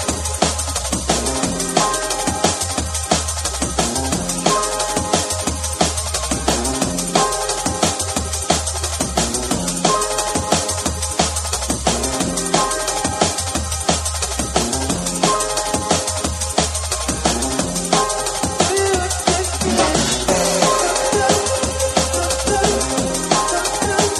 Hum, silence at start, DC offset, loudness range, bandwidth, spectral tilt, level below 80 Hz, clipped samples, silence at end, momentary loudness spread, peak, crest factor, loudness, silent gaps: none; 0 s; under 0.1%; 2 LU; over 20 kHz; -3 dB/octave; -32 dBFS; under 0.1%; 0 s; 4 LU; 0 dBFS; 18 dB; -18 LUFS; none